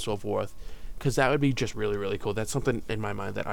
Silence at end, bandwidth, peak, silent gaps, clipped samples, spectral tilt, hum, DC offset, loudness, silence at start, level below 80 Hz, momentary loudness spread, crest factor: 0 s; 18 kHz; -10 dBFS; none; under 0.1%; -5.5 dB/octave; none; 1%; -29 LUFS; 0 s; -42 dBFS; 9 LU; 20 dB